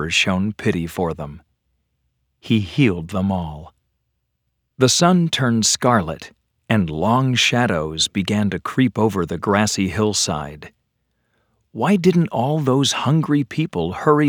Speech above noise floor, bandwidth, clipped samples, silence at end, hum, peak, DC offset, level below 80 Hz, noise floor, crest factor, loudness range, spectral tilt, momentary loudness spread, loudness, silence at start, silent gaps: 54 dB; over 20 kHz; under 0.1%; 0 s; none; 0 dBFS; under 0.1%; -48 dBFS; -73 dBFS; 20 dB; 5 LU; -4.5 dB/octave; 9 LU; -19 LUFS; 0 s; none